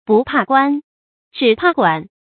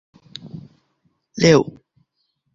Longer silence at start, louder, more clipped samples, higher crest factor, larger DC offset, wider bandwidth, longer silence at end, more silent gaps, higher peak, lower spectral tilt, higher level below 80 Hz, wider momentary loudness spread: second, 0.1 s vs 0.45 s; about the same, -15 LUFS vs -17 LUFS; neither; second, 16 dB vs 22 dB; neither; second, 4.6 kHz vs 7.8 kHz; second, 0.2 s vs 0.9 s; first, 0.84-1.31 s vs none; about the same, 0 dBFS vs -2 dBFS; first, -9.5 dB/octave vs -5.5 dB/octave; about the same, -56 dBFS vs -54 dBFS; second, 7 LU vs 25 LU